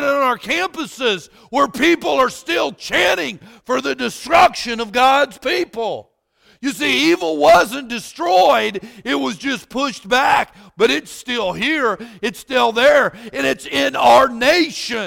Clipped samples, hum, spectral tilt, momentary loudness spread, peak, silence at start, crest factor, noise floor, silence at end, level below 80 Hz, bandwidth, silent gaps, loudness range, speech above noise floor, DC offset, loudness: under 0.1%; none; -3 dB/octave; 11 LU; -2 dBFS; 0 s; 14 dB; -56 dBFS; 0 s; -50 dBFS; 17 kHz; none; 3 LU; 39 dB; under 0.1%; -16 LUFS